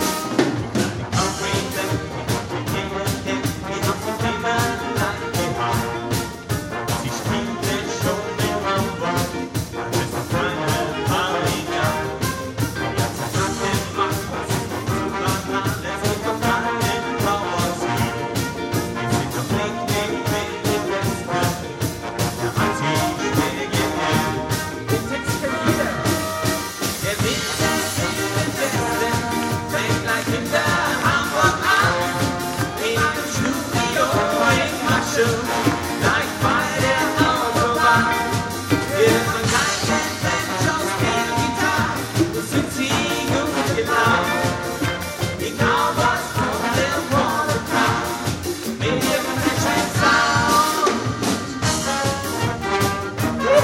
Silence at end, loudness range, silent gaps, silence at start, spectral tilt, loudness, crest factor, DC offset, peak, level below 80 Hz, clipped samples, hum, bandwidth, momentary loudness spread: 0 s; 4 LU; none; 0 s; -4 dB/octave; -21 LUFS; 18 dB; under 0.1%; -4 dBFS; -42 dBFS; under 0.1%; none; 16.5 kHz; 7 LU